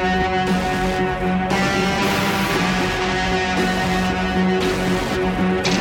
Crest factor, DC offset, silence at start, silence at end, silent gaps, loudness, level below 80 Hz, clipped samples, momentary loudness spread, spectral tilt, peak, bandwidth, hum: 12 dB; under 0.1%; 0 s; 0 s; none; -19 LUFS; -34 dBFS; under 0.1%; 2 LU; -5 dB/octave; -6 dBFS; 17 kHz; none